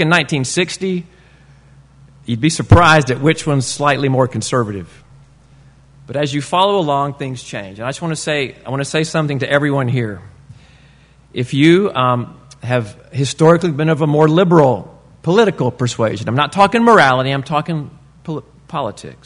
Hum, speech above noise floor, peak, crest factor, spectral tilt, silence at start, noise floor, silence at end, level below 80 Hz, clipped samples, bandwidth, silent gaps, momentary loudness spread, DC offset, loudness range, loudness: none; 32 dB; 0 dBFS; 16 dB; -5.5 dB/octave; 0 s; -47 dBFS; 0.1 s; -42 dBFS; under 0.1%; 11 kHz; none; 15 LU; under 0.1%; 5 LU; -15 LUFS